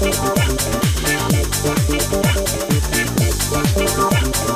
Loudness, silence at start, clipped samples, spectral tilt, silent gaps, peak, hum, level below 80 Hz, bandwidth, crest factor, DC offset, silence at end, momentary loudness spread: -17 LUFS; 0 s; under 0.1%; -4 dB/octave; none; 0 dBFS; none; -26 dBFS; 16 kHz; 16 dB; under 0.1%; 0 s; 2 LU